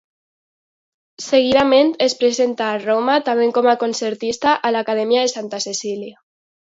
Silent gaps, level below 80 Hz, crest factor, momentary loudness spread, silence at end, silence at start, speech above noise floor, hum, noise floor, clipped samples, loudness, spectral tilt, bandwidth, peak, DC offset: none; -60 dBFS; 16 dB; 10 LU; 0.55 s; 1.2 s; over 73 dB; none; under -90 dBFS; under 0.1%; -17 LUFS; -3 dB/octave; 8 kHz; -2 dBFS; under 0.1%